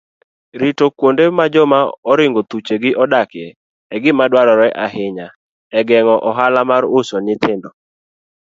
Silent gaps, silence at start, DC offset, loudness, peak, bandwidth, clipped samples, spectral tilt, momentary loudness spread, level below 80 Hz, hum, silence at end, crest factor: 1.98-2.03 s, 3.56-3.90 s, 5.36-5.70 s; 0.55 s; under 0.1%; -14 LUFS; 0 dBFS; 7.8 kHz; under 0.1%; -6 dB/octave; 12 LU; -62 dBFS; none; 0.8 s; 14 dB